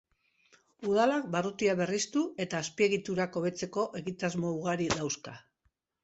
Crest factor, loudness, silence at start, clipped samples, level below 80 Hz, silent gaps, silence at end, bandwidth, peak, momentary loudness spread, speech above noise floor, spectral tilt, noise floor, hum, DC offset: 20 dB; -31 LUFS; 0.8 s; under 0.1%; -66 dBFS; none; 0.65 s; 8.2 kHz; -12 dBFS; 7 LU; 46 dB; -4.5 dB/octave; -77 dBFS; none; under 0.1%